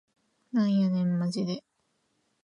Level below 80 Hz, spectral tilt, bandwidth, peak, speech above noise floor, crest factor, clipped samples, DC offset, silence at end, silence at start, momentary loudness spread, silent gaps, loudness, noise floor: -76 dBFS; -7.5 dB/octave; 10 kHz; -18 dBFS; 48 dB; 12 dB; under 0.1%; under 0.1%; 0.85 s; 0.55 s; 8 LU; none; -28 LUFS; -75 dBFS